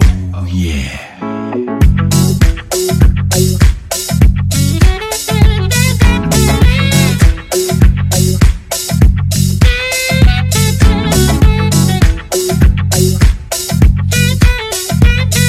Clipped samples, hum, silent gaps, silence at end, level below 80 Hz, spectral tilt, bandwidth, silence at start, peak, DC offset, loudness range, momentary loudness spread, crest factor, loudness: 2%; none; none; 0 s; -14 dBFS; -5 dB/octave; 16 kHz; 0 s; 0 dBFS; under 0.1%; 1 LU; 6 LU; 10 dB; -11 LUFS